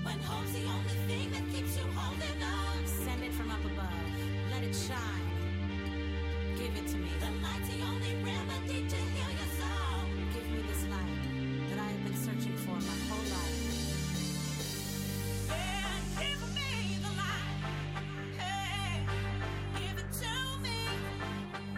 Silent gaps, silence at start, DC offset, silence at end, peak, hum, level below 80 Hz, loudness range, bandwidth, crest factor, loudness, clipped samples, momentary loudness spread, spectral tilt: none; 0 s; under 0.1%; 0 s; -24 dBFS; none; -42 dBFS; 1 LU; 16 kHz; 12 dB; -36 LUFS; under 0.1%; 2 LU; -4.5 dB/octave